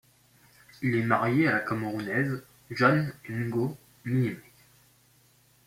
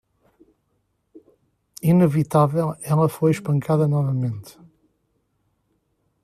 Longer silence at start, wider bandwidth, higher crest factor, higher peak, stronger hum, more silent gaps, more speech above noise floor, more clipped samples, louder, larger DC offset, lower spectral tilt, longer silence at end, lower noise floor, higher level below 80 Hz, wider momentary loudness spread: second, 0.8 s vs 1.15 s; first, 16 kHz vs 14.5 kHz; about the same, 22 dB vs 18 dB; second, -8 dBFS vs -4 dBFS; neither; neither; second, 35 dB vs 51 dB; neither; second, -28 LUFS vs -20 LUFS; neither; about the same, -7.5 dB/octave vs -8.5 dB/octave; second, 1.25 s vs 1.75 s; second, -62 dBFS vs -70 dBFS; second, -66 dBFS vs -60 dBFS; first, 11 LU vs 8 LU